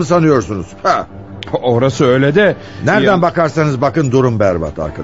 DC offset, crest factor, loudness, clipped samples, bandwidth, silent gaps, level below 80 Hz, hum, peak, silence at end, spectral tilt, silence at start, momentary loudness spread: 0.7%; 12 dB; -13 LUFS; under 0.1%; 8 kHz; none; -42 dBFS; none; 0 dBFS; 0 s; -6.5 dB/octave; 0 s; 9 LU